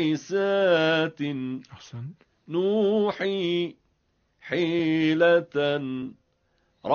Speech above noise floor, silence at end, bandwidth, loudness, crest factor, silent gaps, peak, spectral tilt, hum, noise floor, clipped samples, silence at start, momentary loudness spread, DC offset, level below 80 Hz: 46 dB; 0 s; 6.8 kHz; -25 LUFS; 16 dB; none; -8 dBFS; -4 dB/octave; none; -70 dBFS; under 0.1%; 0 s; 18 LU; under 0.1%; -68 dBFS